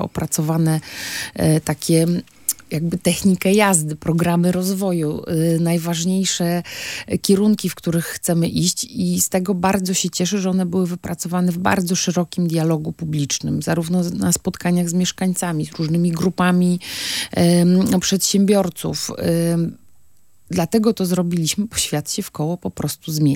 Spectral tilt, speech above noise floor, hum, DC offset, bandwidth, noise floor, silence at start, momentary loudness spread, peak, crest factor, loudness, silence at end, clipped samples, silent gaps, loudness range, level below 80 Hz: -5 dB/octave; 40 dB; none; under 0.1%; 17 kHz; -59 dBFS; 0 s; 8 LU; 0 dBFS; 18 dB; -19 LUFS; 0 s; under 0.1%; none; 3 LU; -50 dBFS